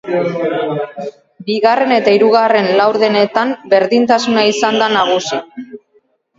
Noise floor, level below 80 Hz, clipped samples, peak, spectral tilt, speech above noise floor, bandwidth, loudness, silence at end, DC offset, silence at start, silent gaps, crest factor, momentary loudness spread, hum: -56 dBFS; -62 dBFS; under 0.1%; 0 dBFS; -4.5 dB/octave; 44 dB; 7.8 kHz; -13 LUFS; 0.6 s; under 0.1%; 0.05 s; none; 14 dB; 13 LU; none